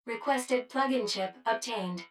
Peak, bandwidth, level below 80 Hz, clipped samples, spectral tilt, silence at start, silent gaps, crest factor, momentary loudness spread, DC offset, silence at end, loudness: -14 dBFS; 16 kHz; -86 dBFS; under 0.1%; -3.5 dB/octave; 0.05 s; none; 18 dB; 4 LU; under 0.1%; 0.05 s; -31 LUFS